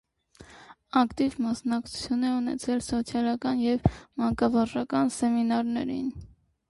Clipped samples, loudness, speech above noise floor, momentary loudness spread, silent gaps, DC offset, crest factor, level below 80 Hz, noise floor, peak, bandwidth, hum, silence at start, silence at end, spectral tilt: under 0.1%; -27 LUFS; 27 dB; 6 LU; none; under 0.1%; 20 dB; -48 dBFS; -53 dBFS; -8 dBFS; 11.5 kHz; none; 0.4 s; 0.45 s; -6 dB/octave